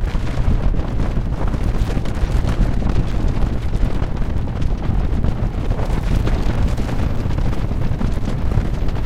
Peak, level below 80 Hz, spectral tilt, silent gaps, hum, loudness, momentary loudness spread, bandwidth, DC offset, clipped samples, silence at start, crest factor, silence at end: -2 dBFS; -20 dBFS; -7.5 dB/octave; none; none; -22 LUFS; 3 LU; 10 kHz; under 0.1%; under 0.1%; 0 s; 14 dB; 0 s